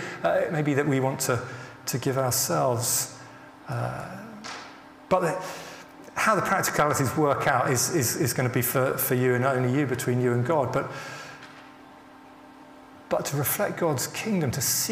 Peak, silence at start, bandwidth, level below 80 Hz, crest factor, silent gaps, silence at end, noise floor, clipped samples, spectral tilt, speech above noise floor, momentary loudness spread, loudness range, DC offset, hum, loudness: -8 dBFS; 0 s; 16 kHz; -60 dBFS; 20 dB; none; 0 s; -48 dBFS; under 0.1%; -4.5 dB/octave; 23 dB; 16 LU; 7 LU; under 0.1%; none; -25 LUFS